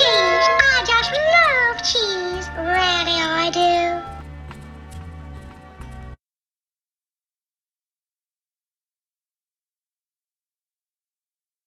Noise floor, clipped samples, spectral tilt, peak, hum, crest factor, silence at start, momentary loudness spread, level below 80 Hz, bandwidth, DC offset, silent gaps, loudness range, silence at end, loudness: under -90 dBFS; under 0.1%; -2.5 dB/octave; 0 dBFS; none; 22 dB; 0 s; 24 LU; -44 dBFS; 12 kHz; under 0.1%; none; 24 LU; 5.5 s; -17 LUFS